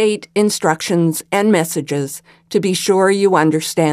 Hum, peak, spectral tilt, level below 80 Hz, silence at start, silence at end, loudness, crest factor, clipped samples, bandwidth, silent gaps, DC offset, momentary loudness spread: none; 0 dBFS; -5 dB/octave; -62 dBFS; 0 s; 0 s; -16 LUFS; 16 dB; under 0.1%; 16 kHz; none; under 0.1%; 9 LU